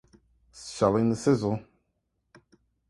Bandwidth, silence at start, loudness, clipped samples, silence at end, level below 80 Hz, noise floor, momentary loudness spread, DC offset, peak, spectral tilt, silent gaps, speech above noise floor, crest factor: 11.5 kHz; 0.55 s; -26 LUFS; under 0.1%; 1.3 s; -58 dBFS; -77 dBFS; 16 LU; under 0.1%; -8 dBFS; -6.5 dB/octave; none; 52 dB; 22 dB